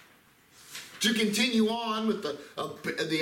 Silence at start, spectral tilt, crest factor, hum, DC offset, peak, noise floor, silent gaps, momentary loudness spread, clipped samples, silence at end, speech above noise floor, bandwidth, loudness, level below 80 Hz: 0.6 s; -3.5 dB/octave; 18 dB; none; under 0.1%; -12 dBFS; -60 dBFS; none; 15 LU; under 0.1%; 0 s; 31 dB; 17 kHz; -28 LUFS; -70 dBFS